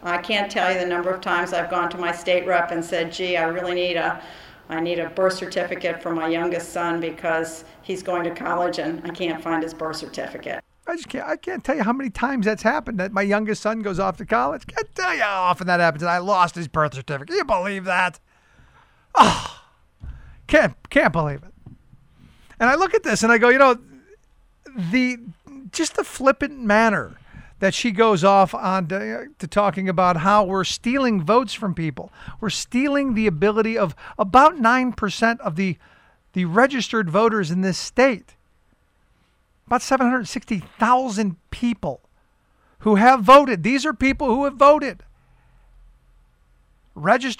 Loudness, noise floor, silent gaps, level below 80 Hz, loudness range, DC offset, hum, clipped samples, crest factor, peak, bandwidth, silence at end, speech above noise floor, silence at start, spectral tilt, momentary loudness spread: -20 LUFS; -62 dBFS; none; -48 dBFS; 7 LU; under 0.1%; none; under 0.1%; 18 dB; -2 dBFS; 16 kHz; 0.05 s; 42 dB; 0 s; -5 dB/octave; 14 LU